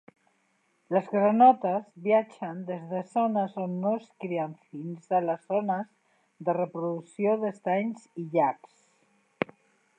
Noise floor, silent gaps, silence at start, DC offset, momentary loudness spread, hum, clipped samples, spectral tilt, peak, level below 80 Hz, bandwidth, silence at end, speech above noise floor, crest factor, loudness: -71 dBFS; none; 0.9 s; under 0.1%; 12 LU; none; under 0.1%; -8.5 dB/octave; -6 dBFS; -82 dBFS; 9.2 kHz; 0.55 s; 44 dB; 22 dB; -28 LUFS